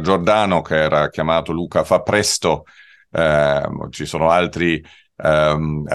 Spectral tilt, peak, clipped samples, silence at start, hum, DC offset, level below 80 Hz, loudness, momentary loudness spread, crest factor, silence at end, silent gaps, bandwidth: -4.5 dB/octave; -2 dBFS; under 0.1%; 0 s; none; under 0.1%; -42 dBFS; -18 LUFS; 9 LU; 16 dB; 0 s; none; 12.5 kHz